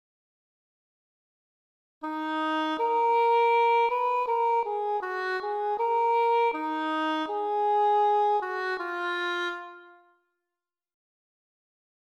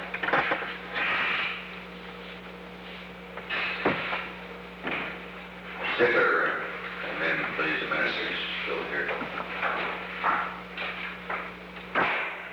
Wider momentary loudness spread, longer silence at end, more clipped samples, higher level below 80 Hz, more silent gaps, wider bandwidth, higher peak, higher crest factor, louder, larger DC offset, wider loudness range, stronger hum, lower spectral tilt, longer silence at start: second, 8 LU vs 15 LU; first, 2.3 s vs 0 s; neither; second, -80 dBFS vs -58 dBFS; neither; second, 12.5 kHz vs over 20 kHz; second, -14 dBFS vs -10 dBFS; second, 12 dB vs 20 dB; about the same, -26 LUFS vs -28 LUFS; neither; about the same, 8 LU vs 6 LU; second, none vs 60 Hz at -50 dBFS; second, -2.5 dB/octave vs -5 dB/octave; first, 2 s vs 0 s